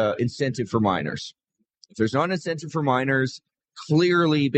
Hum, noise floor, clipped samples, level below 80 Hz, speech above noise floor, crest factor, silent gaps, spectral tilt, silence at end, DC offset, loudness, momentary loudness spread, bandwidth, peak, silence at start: none; -60 dBFS; under 0.1%; -62 dBFS; 37 dB; 16 dB; none; -6.5 dB/octave; 0 s; under 0.1%; -23 LUFS; 16 LU; 8.8 kHz; -6 dBFS; 0 s